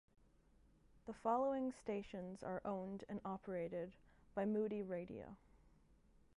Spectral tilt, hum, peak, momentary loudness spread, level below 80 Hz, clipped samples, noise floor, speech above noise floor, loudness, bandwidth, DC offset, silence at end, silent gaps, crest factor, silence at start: -8 dB/octave; none; -26 dBFS; 15 LU; -72 dBFS; under 0.1%; -71 dBFS; 27 dB; -45 LUFS; 11 kHz; under 0.1%; 0.8 s; none; 20 dB; 0.95 s